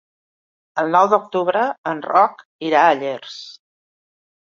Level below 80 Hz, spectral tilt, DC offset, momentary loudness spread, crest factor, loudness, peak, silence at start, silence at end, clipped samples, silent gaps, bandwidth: -74 dBFS; -5 dB/octave; under 0.1%; 15 LU; 18 dB; -18 LUFS; -2 dBFS; 0.75 s; 1.05 s; under 0.1%; 1.78-1.84 s, 2.45-2.59 s; 7.4 kHz